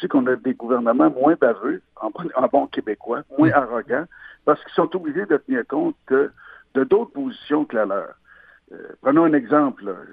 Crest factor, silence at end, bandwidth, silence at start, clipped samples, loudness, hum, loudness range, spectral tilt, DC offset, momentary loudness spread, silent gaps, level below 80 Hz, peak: 20 dB; 0.05 s; 4.8 kHz; 0 s; under 0.1%; -21 LUFS; none; 3 LU; -10 dB/octave; under 0.1%; 11 LU; none; -62 dBFS; -2 dBFS